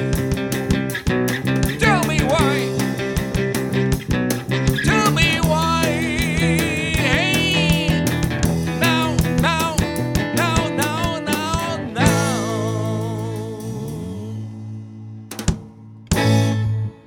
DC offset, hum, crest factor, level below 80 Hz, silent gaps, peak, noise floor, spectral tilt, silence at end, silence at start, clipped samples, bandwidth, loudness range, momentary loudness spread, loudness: under 0.1%; none; 18 dB; -32 dBFS; none; -2 dBFS; -40 dBFS; -5 dB/octave; 0.1 s; 0 s; under 0.1%; 19.5 kHz; 6 LU; 12 LU; -19 LUFS